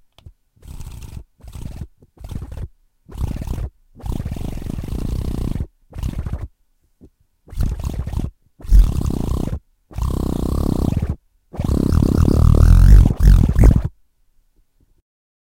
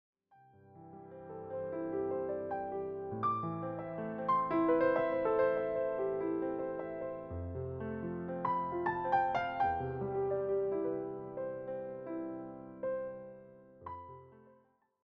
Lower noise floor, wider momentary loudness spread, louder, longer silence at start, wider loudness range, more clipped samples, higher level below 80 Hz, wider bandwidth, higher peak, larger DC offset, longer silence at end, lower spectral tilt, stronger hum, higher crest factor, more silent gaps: second, -60 dBFS vs -69 dBFS; first, 23 LU vs 17 LU; first, -19 LUFS vs -36 LUFS; second, 0.25 s vs 0.65 s; first, 16 LU vs 9 LU; neither; first, -20 dBFS vs -64 dBFS; first, 15.5 kHz vs 5.8 kHz; first, 0 dBFS vs -18 dBFS; neither; first, 1.6 s vs 0.55 s; first, -8 dB/octave vs -6.5 dB/octave; neither; about the same, 18 dB vs 18 dB; neither